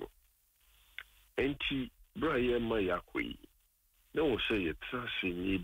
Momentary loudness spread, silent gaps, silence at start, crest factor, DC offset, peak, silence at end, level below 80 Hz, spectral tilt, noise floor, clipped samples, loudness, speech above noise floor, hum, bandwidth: 18 LU; none; 0 s; 14 dB; under 0.1%; -22 dBFS; 0 s; -54 dBFS; -6.5 dB/octave; -71 dBFS; under 0.1%; -35 LUFS; 37 dB; none; 16 kHz